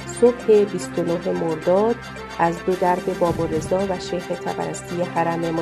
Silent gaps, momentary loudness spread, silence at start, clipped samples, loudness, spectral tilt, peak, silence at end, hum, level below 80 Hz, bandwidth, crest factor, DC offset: none; 9 LU; 0 s; under 0.1%; -21 LUFS; -6 dB/octave; -4 dBFS; 0 s; none; -48 dBFS; 13.5 kHz; 18 dB; under 0.1%